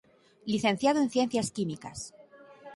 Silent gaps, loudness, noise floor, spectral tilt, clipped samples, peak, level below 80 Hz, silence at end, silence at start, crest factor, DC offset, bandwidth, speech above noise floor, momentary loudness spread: none; -29 LUFS; -52 dBFS; -4.5 dB/octave; under 0.1%; -12 dBFS; -64 dBFS; 0 s; 0.45 s; 18 dB; under 0.1%; 11.5 kHz; 23 dB; 17 LU